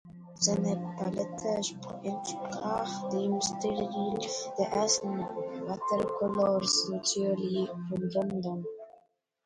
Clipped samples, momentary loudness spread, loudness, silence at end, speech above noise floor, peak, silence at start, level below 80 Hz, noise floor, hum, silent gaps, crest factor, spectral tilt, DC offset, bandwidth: under 0.1%; 9 LU; -31 LUFS; 0.55 s; 35 dB; -10 dBFS; 0.05 s; -66 dBFS; -66 dBFS; none; none; 20 dB; -4 dB/octave; under 0.1%; 11 kHz